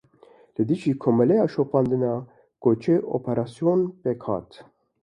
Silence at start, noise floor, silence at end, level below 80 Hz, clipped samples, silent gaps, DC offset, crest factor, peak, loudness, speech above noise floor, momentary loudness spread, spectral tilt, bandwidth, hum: 0.6 s; -54 dBFS; 0.4 s; -60 dBFS; under 0.1%; none; under 0.1%; 16 dB; -8 dBFS; -24 LUFS; 32 dB; 9 LU; -9.5 dB/octave; 10.5 kHz; none